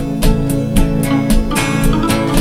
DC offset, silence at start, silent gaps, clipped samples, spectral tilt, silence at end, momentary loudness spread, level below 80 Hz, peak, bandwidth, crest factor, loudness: 0.7%; 0 s; none; under 0.1%; -5.5 dB/octave; 0 s; 1 LU; -18 dBFS; 0 dBFS; 16 kHz; 12 dB; -15 LUFS